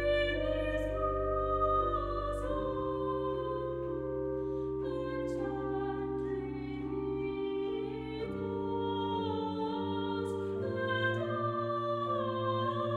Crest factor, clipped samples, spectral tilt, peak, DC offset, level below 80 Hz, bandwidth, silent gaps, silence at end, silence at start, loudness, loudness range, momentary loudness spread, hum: 14 dB; under 0.1%; -7.5 dB/octave; -20 dBFS; under 0.1%; -48 dBFS; 11.5 kHz; none; 0 s; 0 s; -34 LUFS; 3 LU; 6 LU; none